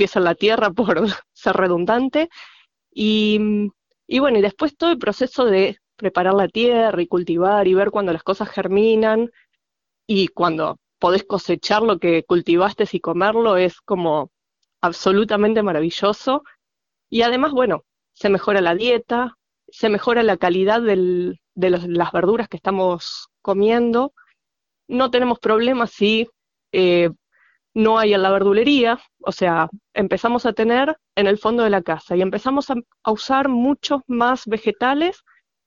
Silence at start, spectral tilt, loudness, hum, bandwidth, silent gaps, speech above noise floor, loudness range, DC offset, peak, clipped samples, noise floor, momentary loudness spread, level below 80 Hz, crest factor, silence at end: 0 s; -6 dB/octave; -19 LUFS; none; 7.4 kHz; none; 66 dB; 2 LU; under 0.1%; -2 dBFS; under 0.1%; -83 dBFS; 7 LU; -56 dBFS; 18 dB; 0.55 s